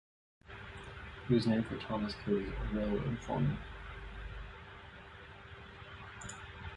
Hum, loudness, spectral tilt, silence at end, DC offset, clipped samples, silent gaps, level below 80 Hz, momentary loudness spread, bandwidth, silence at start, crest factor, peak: none; -37 LUFS; -7 dB/octave; 0 s; under 0.1%; under 0.1%; none; -50 dBFS; 18 LU; 11 kHz; 0.45 s; 20 dB; -18 dBFS